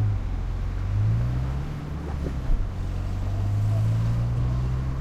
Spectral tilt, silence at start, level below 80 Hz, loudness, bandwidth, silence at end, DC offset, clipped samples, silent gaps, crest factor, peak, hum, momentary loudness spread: -8 dB/octave; 0 s; -30 dBFS; -27 LUFS; 8.2 kHz; 0 s; under 0.1%; under 0.1%; none; 12 dB; -12 dBFS; none; 7 LU